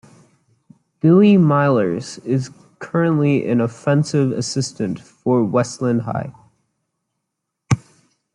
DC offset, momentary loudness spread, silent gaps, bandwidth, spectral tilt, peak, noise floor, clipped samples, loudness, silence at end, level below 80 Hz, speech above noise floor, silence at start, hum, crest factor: under 0.1%; 13 LU; none; 11 kHz; -7 dB/octave; -2 dBFS; -78 dBFS; under 0.1%; -18 LUFS; 0.55 s; -58 dBFS; 61 dB; 1.05 s; none; 16 dB